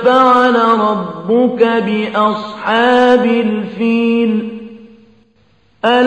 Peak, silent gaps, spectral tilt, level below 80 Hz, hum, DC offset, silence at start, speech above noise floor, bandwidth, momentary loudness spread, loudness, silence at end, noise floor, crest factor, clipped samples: 0 dBFS; none; -6.5 dB/octave; -58 dBFS; none; 0.2%; 0 s; 42 dB; 8.6 kHz; 10 LU; -13 LUFS; 0 s; -54 dBFS; 12 dB; under 0.1%